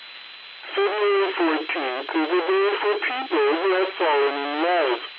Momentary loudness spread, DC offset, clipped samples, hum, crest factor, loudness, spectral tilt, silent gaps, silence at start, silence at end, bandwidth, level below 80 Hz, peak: 6 LU; under 0.1%; under 0.1%; none; 12 dB; -22 LUFS; -4.5 dB/octave; none; 0 s; 0 s; 5.2 kHz; -88 dBFS; -12 dBFS